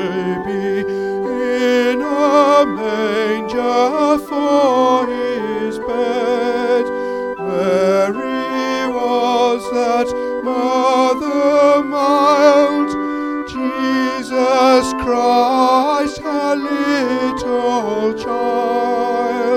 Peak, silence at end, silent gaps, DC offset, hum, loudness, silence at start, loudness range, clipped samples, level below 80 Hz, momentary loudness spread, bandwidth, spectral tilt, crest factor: 0 dBFS; 0 s; none; under 0.1%; none; -16 LUFS; 0 s; 3 LU; under 0.1%; -50 dBFS; 8 LU; 15.5 kHz; -4.5 dB/octave; 14 dB